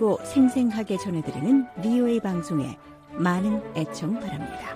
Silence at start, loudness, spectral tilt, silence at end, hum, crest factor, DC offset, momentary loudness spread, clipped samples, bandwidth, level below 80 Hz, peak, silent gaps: 0 s; -25 LUFS; -7 dB/octave; 0 s; none; 14 dB; under 0.1%; 11 LU; under 0.1%; 14.5 kHz; -56 dBFS; -10 dBFS; none